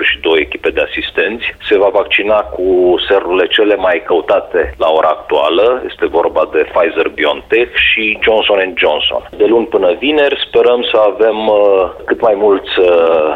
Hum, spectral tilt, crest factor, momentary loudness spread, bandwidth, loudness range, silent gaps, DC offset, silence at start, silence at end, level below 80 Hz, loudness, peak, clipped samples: none; -5.5 dB/octave; 10 dB; 5 LU; 5 kHz; 2 LU; none; under 0.1%; 0 s; 0 s; -40 dBFS; -11 LUFS; 0 dBFS; under 0.1%